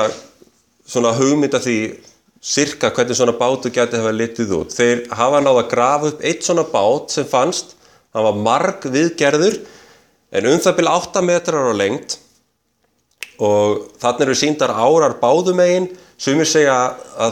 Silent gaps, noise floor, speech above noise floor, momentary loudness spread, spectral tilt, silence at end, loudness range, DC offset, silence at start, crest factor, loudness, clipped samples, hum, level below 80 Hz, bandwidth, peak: none; -65 dBFS; 49 dB; 8 LU; -4 dB/octave; 0 s; 3 LU; under 0.1%; 0 s; 16 dB; -16 LUFS; under 0.1%; none; -58 dBFS; 16 kHz; 0 dBFS